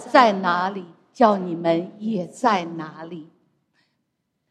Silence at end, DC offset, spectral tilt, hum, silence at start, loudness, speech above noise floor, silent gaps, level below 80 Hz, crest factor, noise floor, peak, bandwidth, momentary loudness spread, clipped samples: 1.25 s; under 0.1%; -6 dB/octave; none; 0 s; -21 LUFS; 54 dB; none; -74 dBFS; 22 dB; -75 dBFS; 0 dBFS; 11 kHz; 19 LU; under 0.1%